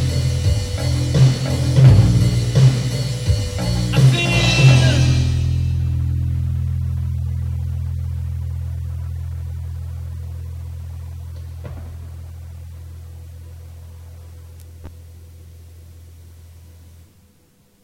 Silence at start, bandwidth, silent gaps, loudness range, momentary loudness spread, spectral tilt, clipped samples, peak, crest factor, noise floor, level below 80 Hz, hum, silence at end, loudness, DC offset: 0 s; 12 kHz; none; 22 LU; 25 LU; -6 dB/octave; under 0.1%; 0 dBFS; 18 dB; -55 dBFS; -30 dBFS; none; 1.2 s; -18 LUFS; under 0.1%